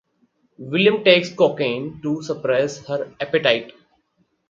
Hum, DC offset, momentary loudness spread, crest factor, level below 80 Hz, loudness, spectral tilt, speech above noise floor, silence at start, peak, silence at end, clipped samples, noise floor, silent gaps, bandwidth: none; under 0.1%; 11 LU; 20 dB; -64 dBFS; -20 LUFS; -5 dB/octave; 47 dB; 0.6 s; 0 dBFS; 0.8 s; under 0.1%; -67 dBFS; none; 7.6 kHz